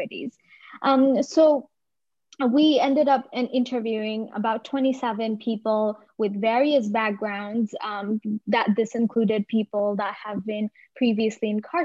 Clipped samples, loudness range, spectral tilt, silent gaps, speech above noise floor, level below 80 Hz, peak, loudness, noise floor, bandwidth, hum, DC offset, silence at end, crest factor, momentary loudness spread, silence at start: under 0.1%; 4 LU; -6 dB/octave; none; 65 dB; -74 dBFS; -8 dBFS; -24 LUFS; -88 dBFS; 7.8 kHz; none; under 0.1%; 0 s; 16 dB; 10 LU; 0 s